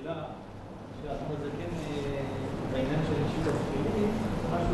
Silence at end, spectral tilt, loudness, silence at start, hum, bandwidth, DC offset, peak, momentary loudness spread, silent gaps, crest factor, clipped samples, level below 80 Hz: 0 s; -7 dB/octave; -32 LUFS; 0 s; none; 12 kHz; under 0.1%; -16 dBFS; 12 LU; none; 14 dB; under 0.1%; -44 dBFS